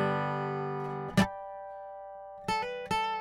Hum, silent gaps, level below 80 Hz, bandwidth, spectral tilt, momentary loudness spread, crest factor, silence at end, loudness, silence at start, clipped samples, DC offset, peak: none; none; -56 dBFS; 16 kHz; -5.5 dB/octave; 15 LU; 22 dB; 0 s; -33 LUFS; 0 s; under 0.1%; under 0.1%; -12 dBFS